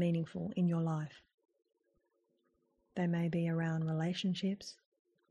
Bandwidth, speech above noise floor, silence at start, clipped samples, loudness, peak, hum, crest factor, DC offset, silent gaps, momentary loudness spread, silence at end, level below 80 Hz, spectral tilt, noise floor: 8.6 kHz; 44 dB; 0 s; under 0.1%; -36 LUFS; -24 dBFS; none; 14 dB; under 0.1%; 1.34-1.38 s; 10 LU; 0.55 s; -74 dBFS; -7.5 dB/octave; -79 dBFS